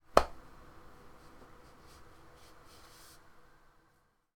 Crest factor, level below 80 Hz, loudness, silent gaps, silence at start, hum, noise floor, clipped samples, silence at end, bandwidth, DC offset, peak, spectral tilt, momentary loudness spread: 36 dB; -54 dBFS; -32 LUFS; none; 0.15 s; none; -71 dBFS; under 0.1%; 3.95 s; 20 kHz; under 0.1%; -4 dBFS; -4 dB/octave; 20 LU